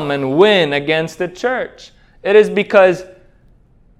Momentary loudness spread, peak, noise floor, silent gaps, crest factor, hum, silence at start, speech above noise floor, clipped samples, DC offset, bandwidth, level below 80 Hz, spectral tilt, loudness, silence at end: 12 LU; 0 dBFS; -49 dBFS; none; 16 dB; none; 0 s; 35 dB; under 0.1%; under 0.1%; 11.5 kHz; -52 dBFS; -5.5 dB/octave; -14 LUFS; 0.95 s